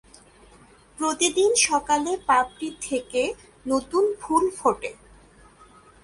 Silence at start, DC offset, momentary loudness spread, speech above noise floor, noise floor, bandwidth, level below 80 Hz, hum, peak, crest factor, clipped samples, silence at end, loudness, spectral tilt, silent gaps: 1 s; under 0.1%; 11 LU; 29 dB; -52 dBFS; 11.5 kHz; -56 dBFS; none; -6 dBFS; 18 dB; under 0.1%; 1.1 s; -23 LUFS; -1.5 dB/octave; none